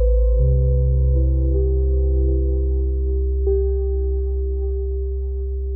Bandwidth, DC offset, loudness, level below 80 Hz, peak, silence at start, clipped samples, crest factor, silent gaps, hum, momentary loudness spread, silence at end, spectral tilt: 1.1 kHz; 0.2%; -21 LUFS; -18 dBFS; -8 dBFS; 0 s; under 0.1%; 10 dB; none; none; 7 LU; 0 s; -16.5 dB/octave